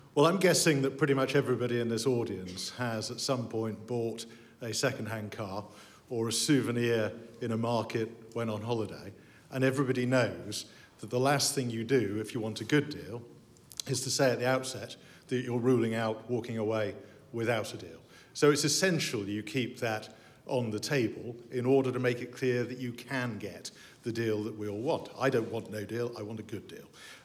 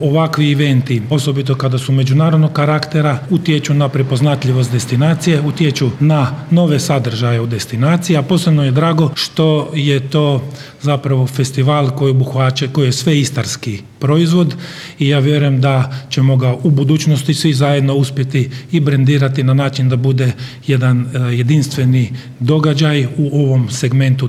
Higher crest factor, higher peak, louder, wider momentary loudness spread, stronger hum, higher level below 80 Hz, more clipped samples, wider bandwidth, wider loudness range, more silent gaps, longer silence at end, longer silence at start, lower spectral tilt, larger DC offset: first, 20 dB vs 12 dB; second, -12 dBFS vs -2 dBFS; second, -31 LUFS vs -14 LUFS; first, 16 LU vs 5 LU; neither; second, -74 dBFS vs -54 dBFS; neither; first, 15.5 kHz vs 13.5 kHz; first, 4 LU vs 1 LU; neither; about the same, 0.05 s vs 0 s; about the same, 0.05 s vs 0 s; second, -4.5 dB/octave vs -6.5 dB/octave; neither